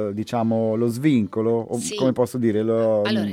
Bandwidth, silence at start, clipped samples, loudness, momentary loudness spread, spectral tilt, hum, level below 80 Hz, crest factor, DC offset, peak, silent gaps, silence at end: 15.5 kHz; 0 s; under 0.1%; -22 LUFS; 4 LU; -6 dB/octave; none; -64 dBFS; 14 dB; under 0.1%; -8 dBFS; none; 0 s